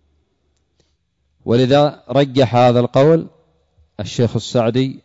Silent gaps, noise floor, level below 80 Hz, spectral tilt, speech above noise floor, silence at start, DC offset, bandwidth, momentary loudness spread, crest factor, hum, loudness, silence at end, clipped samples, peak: none; -66 dBFS; -52 dBFS; -7 dB/octave; 51 dB; 1.45 s; under 0.1%; 8 kHz; 13 LU; 14 dB; none; -15 LUFS; 0.05 s; under 0.1%; -4 dBFS